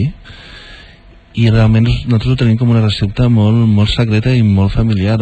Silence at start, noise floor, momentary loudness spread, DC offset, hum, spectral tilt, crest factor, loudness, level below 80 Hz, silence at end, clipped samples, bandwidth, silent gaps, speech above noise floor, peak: 0 s; -40 dBFS; 5 LU; under 0.1%; none; -8 dB/octave; 12 dB; -12 LUFS; -28 dBFS; 0 s; under 0.1%; 8.6 kHz; none; 29 dB; 0 dBFS